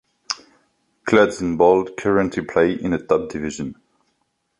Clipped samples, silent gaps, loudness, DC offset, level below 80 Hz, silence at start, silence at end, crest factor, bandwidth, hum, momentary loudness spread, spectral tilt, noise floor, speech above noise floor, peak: under 0.1%; none; -20 LUFS; under 0.1%; -50 dBFS; 0.3 s; 0.85 s; 18 dB; 11 kHz; none; 13 LU; -5.5 dB/octave; -70 dBFS; 52 dB; -2 dBFS